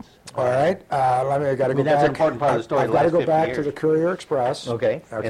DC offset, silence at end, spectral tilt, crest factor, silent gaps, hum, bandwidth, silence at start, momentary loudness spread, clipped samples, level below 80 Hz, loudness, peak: under 0.1%; 0 s; -6.5 dB/octave; 14 dB; none; none; 13 kHz; 0.25 s; 5 LU; under 0.1%; -54 dBFS; -21 LUFS; -6 dBFS